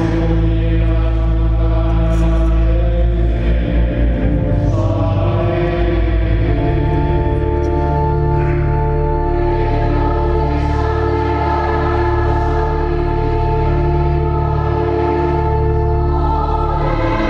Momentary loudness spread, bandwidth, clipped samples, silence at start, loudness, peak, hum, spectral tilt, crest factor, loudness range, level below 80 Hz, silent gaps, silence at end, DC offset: 1 LU; 6 kHz; under 0.1%; 0 s; -16 LUFS; -4 dBFS; none; -9 dB/octave; 10 dB; 0 LU; -18 dBFS; none; 0 s; under 0.1%